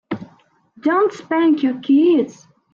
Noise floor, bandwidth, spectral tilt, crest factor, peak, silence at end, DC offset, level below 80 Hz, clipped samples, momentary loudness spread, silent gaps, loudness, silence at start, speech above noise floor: -54 dBFS; 7.2 kHz; -6.5 dB/octave; 12 dB; -6 dBFS; 0.4 s; under 0.1%; -68 dBFS; under 0.1%; 14 LU; none; -17 LUFS; 0.1 s; 38 dB